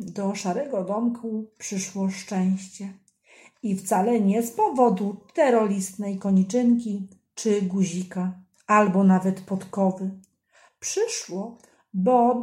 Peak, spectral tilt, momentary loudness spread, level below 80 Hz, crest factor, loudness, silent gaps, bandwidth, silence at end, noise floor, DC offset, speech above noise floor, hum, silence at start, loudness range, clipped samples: -6 dBFS; -6 dB/octave; 14 LU; -70 dBFS; 18 dB; -24 LUFS; none; 15.5 kHz; 0 s; -60 dBFS; under 0.1%; 37 dB; none; 0 s; 6 LU; under 0.1%